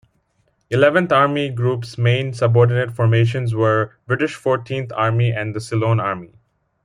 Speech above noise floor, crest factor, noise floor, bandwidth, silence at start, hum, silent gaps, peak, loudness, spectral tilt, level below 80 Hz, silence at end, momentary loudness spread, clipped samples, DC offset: 47 dB; 16 dB; -65 dBFS; 10.5 kHz; 0.7 s; none; none; -2 dBFS; -18 LUFS; -7 dB/octave; -56 dBFS; 0.6 s; 8 LU; under 0.1%; under 0.1%